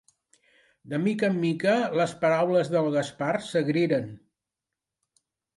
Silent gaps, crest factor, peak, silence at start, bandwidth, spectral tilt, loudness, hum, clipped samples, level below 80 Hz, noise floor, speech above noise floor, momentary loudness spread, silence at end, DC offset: none; 16 dB; -12 dBFS; 0.85 s; 11.5 kHz; -6.5 dB/octave; -25 LUFS; none; under 0.1%; -72 dBFS; -88 dBFS; 63 dB; 5 LU; 1.4 s; under 0.1%